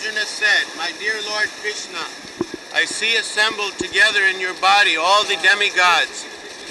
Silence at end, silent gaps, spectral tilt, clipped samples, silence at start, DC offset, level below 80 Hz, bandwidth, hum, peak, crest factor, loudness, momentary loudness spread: 0 s; none; 0 dB/octave; under 0.1%; 0 s; under 0.1%; -60 dBFS; 12 kHz; none; -4 dBFS; 16 dB; -17 LUFS; 15 LU